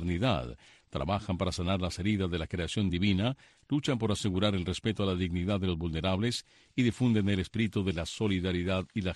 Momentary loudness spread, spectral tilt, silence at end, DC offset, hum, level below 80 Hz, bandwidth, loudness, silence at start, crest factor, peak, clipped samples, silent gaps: 6 LU; -6 dB/octave; 0 s; under 0.1%; none; -48 dBFS; 12 kHz; -31 LUFS; 0 s; 16 dB; -16 dBFS; under 0.1%; none